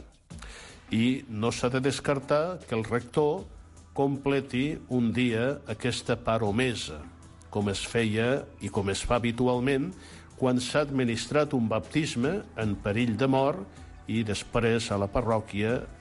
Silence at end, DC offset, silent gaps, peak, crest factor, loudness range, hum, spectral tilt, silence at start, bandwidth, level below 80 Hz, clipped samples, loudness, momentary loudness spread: 0 s; under 0.1%; none; -12 dBFS; 16 dB; 2 LU; none; -5.5 dB/octave; 0 s; 11.5 kHz; -48 dBFS; under 0.1%; -28 LUFS; 11 LU